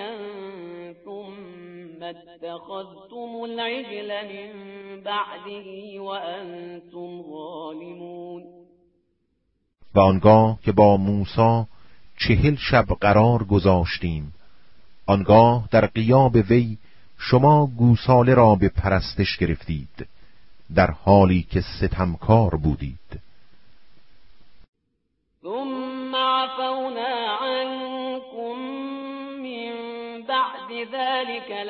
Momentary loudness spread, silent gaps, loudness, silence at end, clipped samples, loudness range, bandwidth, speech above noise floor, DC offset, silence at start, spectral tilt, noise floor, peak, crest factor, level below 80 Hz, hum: 22 LU; 24.68-24.73 s; -20 LUFS; 0 s; under 0.1%; 17 LU; 5.8 kHz; 54 dB; under 0.1%; 0 s; -11 dB/octave; -74 dBFS; -2 dBFS; 20 dB; -40 dBFS; none